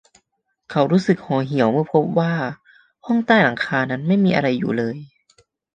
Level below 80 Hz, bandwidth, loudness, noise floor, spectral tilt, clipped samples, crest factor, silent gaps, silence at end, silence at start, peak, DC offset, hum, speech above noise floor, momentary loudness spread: -60 dBFS; 8.8 kHz; -19 LUFS; -72 dBFS; -7.5 dB/octave; under 0.1%; 18 dB; none; 0.7 s; 0.7 s; -2 dBFS; under 0.1%; none; 54 dB; 10 LU